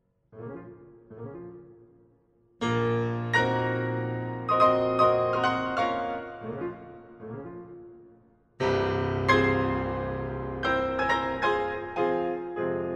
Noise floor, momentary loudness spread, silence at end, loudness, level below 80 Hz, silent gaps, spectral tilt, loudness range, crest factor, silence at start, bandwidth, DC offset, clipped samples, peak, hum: -64 dBFS; 21 LU; 0 s; -27 LUFS; -52 dBFS; none; -6.5 dB/octave; 8 LU; 22 dB; 0.35 s; 10 kHz; under 0.1%; under 0.1%; -8 dBFS; none